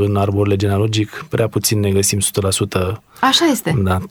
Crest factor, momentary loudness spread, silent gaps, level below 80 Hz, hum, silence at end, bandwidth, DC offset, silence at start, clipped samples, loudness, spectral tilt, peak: 16 dB; 7 LU; none; -46 dBFS; none; 0 s; 18 kHz; under 0.1%; 0 s; under 0.1%; -16 LUFS; -4.5 dB/octave; 0 dBFS